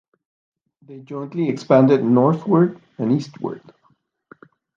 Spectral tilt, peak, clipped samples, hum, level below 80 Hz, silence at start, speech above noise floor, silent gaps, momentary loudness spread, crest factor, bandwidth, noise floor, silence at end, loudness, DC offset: -9 dB/octave; -2 dBFS; under 0.1%; none; -68 dBFS; 0.9 s; 44 dB; none; 16 LU; 18 dB; 7.4 kHz; -63 dBFS; 1.2 s; -18 LUFS; under 0.1%